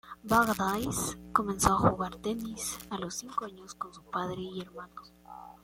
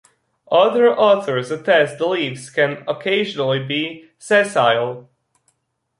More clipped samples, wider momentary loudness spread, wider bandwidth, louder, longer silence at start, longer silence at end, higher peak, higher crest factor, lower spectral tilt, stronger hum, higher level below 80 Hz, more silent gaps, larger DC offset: neither; first, 20 LU vs 9 LU; first, 16.5 kHz vs 11.5 kHz; second, -31 LUFS vs -18 LUFS; second, 0.05 s vs 0.5 s; second, 0.1 s vs 1 s; second, -8 dBFS vs -2 dBFS; first, 24 dB vs 16 dB; about the same, -4.5 dB/octave vs -4.5 dB/octave; first, 60 Hz at -50 dBFS vs none; first, -52 dBFS vs -68 dBFS; neither; neither